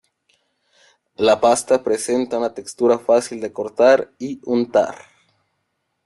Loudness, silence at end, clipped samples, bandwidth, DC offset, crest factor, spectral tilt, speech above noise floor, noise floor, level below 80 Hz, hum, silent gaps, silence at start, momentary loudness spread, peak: -19 LUFS; 1.1 s; under 0.1%; 12.5 kHz; under 0.1%; 18 dB; -4 dB/octave; 55 dB; -73 dBFS; -64 dBFS; none; none; 1.2 s; 12 LU; -2 dBFS